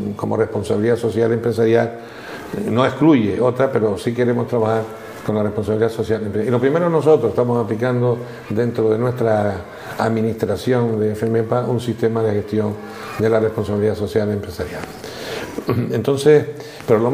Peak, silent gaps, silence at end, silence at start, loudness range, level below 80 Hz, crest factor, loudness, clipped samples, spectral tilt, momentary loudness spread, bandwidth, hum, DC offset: 0 dBFS; none; 0 s; 0 s; 3 LU; -50 dBFS; 18 dB; -19 LUFS; under 0.1%; -7.5 dB/octave; 13 LU; 16 kHz; none; under 0.1%